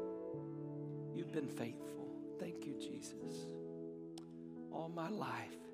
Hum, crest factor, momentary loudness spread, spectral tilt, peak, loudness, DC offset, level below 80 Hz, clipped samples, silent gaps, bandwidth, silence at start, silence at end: none; 18 dB; 7 LU; -6 dB/octave; -28 dBFS; -47 LUFS; under 0.1%; -82 dBFS; under 0.1%; none; 15.5 kHz; 0 s; 0 s